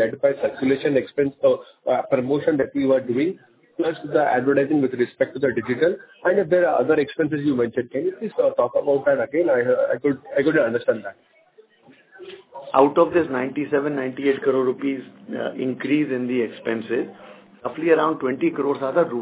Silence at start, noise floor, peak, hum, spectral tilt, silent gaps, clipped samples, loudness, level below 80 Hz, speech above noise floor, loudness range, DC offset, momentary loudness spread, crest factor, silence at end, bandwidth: 0 s; -54 dBFS; 0 dBFS; none; -10.5 dB/octave; none; under 0.1%; -21 LUFS; -64 dBFS; 33 dB; 3 LU; under 0.1%; 8 LU; 20 dB; 0 s; 4 kHz